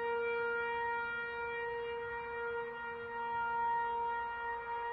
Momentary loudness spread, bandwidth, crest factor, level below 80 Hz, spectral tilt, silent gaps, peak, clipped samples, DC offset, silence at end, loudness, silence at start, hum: 6 LU; 5 kHz; 10 dB; -66 dBFS; -6 dB/octave; none; -28 dBFS; under 0.1%; under 0.1%; 0 s; -38 LUFS; 0 s; none